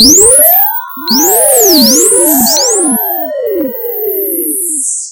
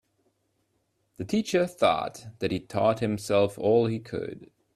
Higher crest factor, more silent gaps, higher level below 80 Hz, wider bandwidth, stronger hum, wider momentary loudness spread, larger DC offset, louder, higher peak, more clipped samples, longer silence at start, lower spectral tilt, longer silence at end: second, 8 dB vs 18 dB; neither; first, -40 dBFS vs -62 dBFS; first, over 20 kHz vs 14 kHz; neither; about the same, 12 LU vs 13 LU; neither; first, -6 LUFS vs -26 LUFS; first, 0 dBFS vs -8 dBFS; first, 2% vs under 0.1%; second, 0 s vs 1.2 s; second, -1 dB/octave vs -6 dB/octave; second, 0 s vs 0.3 s